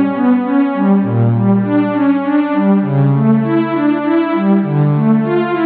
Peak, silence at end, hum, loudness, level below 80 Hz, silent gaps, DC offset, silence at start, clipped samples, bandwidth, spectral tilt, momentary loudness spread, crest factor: -2 dBFS; 0 s; none; -13 LUFS; -64 dBFS; none; under 0.1%; 0 s; under 0.1%; 4.5 kHz; -12.5 dB/octave; 2 LU; 10 dB